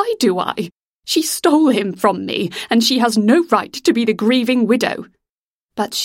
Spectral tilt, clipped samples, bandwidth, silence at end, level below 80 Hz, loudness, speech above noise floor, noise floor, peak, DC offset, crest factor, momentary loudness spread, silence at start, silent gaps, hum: -4 dB/octave; under 0.1%; 16.5 kHz; 0 s; -62 dBFS; -16 LUFS; 71 dB; -87 dBFS; 0 dBFS; under 0.1%; 16 dB; 11 LU; 0 s; 0.77-0.99 s, 5.29-5.69 s; none